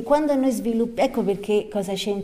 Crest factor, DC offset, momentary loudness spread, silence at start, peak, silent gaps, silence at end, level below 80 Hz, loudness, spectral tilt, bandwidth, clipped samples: 16 dB; under 0.1%; 6 LU; 0 s; -6 dBFS; none; 0 s; -50 dBFS; -23 LUFS; -5.5 dB/octave; 16 kHz; under 0.1%